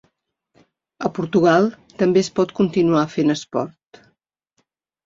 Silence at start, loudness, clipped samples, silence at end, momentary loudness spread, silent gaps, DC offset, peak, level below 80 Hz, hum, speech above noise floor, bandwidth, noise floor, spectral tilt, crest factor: 1 s; -19 LUFS; under 0.1%; 1.4 s; 11 LU; none; under 0.1%; -2 dBFS; -60 dBFS; none; 52 dB; 7.6 kHz; -70 dBFS; -6.5 dB/octave; 18 dB